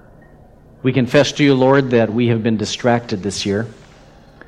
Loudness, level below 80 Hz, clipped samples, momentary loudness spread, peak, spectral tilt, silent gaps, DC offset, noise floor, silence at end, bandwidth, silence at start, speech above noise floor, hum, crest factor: -16 LUFS; -50 dBFS; under 0.1%; 9 LU; 0 dBFS; -5.5 dB/octave; none; under 0.1%; -44 dBFS; 0.75 s; 11.5 kHz; 0.85 s; 29 dB; none; 16 dB